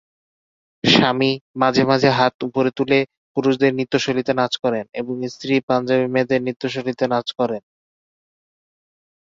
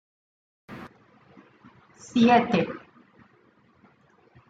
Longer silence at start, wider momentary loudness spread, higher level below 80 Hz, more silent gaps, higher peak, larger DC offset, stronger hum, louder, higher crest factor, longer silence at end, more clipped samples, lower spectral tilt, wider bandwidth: first, 0.85 s vs 0.7 s; second, 9 LU vs 26 LU; first, -58 dBFS vs -68 dBFS; first, 1.41-1.54 s, 2.34-2.39 s, 3.17-3.35 s, 4.89-4.93 s, 5.63-5.68 s, 6.56-6.60 s vs none; first, -2 dBFS vs -8 dBFS; neither; neither; first, -19 LUFS vs -22 LUFS; about the same, 18 dB vs 22 dB; about the same, 1.6 s vs 1.7 s; neither; about the same, -5.5 dB/octave vs -6 dB/octave; about the same, 7.6 kHz vs 7.8 kHz